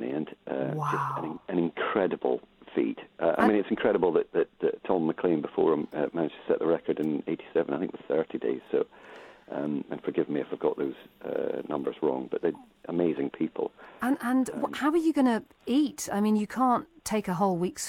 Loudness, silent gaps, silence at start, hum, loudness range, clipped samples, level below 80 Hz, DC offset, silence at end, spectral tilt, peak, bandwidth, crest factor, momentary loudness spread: -29 LUFS; none; 0 s; none; 5 LU; under 0.1%; -66 dBFS; under 0.1%; 0 s; -6 dB/octave; -10 dBFS; 16.5 kHz; 20 dB; 9 LU